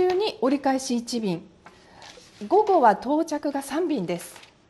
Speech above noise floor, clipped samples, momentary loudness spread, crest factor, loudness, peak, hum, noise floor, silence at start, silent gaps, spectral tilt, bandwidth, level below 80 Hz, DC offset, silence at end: 26 dB; under 0.1%; 13 LU; 18 dB; -24 LUFS; -6 dBFS; none; -50 dBFS; 0 s; none; -5 dB/octave; 12.5 kHz; -64 dBFS; under 0.1%; 0.3 s